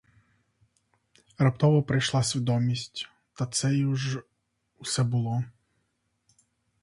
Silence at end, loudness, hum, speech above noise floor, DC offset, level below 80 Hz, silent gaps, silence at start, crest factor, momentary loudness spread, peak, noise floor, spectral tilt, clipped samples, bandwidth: 1.35 s; -27 LUFS; none; 50 dB; under 0.1%; -62 dBFS; none; 1.4 s; 18 dB; 14 LU; -10 dBFS; -76 dBFS; -5.5 dB/octave; under 0.1%; 11.5 kHz